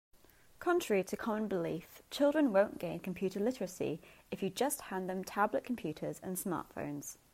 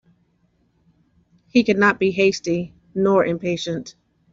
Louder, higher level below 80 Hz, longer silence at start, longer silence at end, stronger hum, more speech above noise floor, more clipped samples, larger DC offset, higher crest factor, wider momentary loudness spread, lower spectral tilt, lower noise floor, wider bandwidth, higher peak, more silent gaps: second, -36 LUFS vs -20 LUFS; second, -68 dBFS vs -58 dBFS; second, 0.15 s vs 1.55 s; second, 0.2 s vs 0.4 s; neither; second, 22 dB vs 45 dB; neither; neither; about the same, 20 dB vs 18 dB; about the same, 11 LU vs 12 LU; about the same, -5 dB/octave vs -5.5 dB/octave; second, -57 dBFS vs -64 dBFS; first, 16 kHz vs 7.6 kHz; second, -16 dBFS vs -4 dBFS; neither